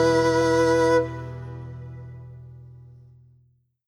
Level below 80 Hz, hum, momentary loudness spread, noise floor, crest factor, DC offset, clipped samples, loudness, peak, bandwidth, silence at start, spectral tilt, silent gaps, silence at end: -50 dBFS; none; 24 LU; -63 dBFS; 16 dB; under 0.1%; under 0.1%; -21 LUFS; -8 dBFS; 14.5 kHz; 0 s; -5.5 dB/octave; none; 1.05 s